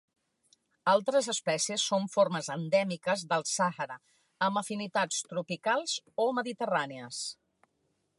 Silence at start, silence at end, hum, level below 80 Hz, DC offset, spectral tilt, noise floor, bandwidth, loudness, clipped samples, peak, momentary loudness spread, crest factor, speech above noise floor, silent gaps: 0.85 s; 0.85 s; none; -84 dBFS; under 0.1%; -3 dB/octave; -77 dBFS; 11.5 kHz; -31 LUFS; under 0.1%; -12 dBFS; 10 LU; 18 dB; 46 dB; none